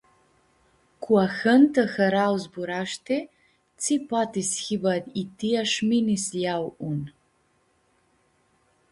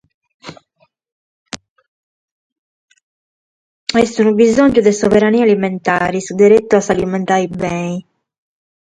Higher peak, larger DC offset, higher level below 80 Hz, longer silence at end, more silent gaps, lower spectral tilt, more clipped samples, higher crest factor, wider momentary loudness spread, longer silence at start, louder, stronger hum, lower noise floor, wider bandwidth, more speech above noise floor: second, -6 dBFS vs 0 dBFS; neither; second, -66 dBFS vs -48 dBFS; first, 1.8 s vs 0.8 s; second, none vs 1.12-1.46 s, 1.70-1.76 s, 1.88-2.88 s, 3.03-3.87 s; about the same, -4.5 dB/octave vs -5.5 dB/octave; neither; about the same, 18 dB vs 16 dB; second, 11 LU vs 15 LU; first, 1 s vs 0.45 s; second, -24 LUFS vs -13 LUFS; neither; first, -67 dBFS vs -60 dBFS; first, 11.5 kHz vs 10 kHz; second, 43 dB vs 47 dB